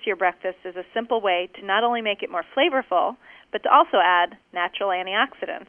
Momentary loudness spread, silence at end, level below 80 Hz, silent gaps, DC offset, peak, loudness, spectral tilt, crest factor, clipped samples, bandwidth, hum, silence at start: 12 LU; 0.05 s; -70 dBFS; none; under 0.1%; -2 dBFS; -22 LUFS; -6 dB/octave; 20 dB; under 0.1%; 3.6 kHz; none; 0 s